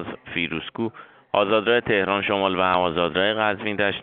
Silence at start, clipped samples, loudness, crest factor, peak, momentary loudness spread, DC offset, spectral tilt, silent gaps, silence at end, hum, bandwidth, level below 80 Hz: 0 s; under 0.1%; -22 LUFS; 18 dB; -4 dBFS; 9 LU; under 0.1%; -2 dB/octave; none; 0 s; none; 4.6 kHz; -56 dBFS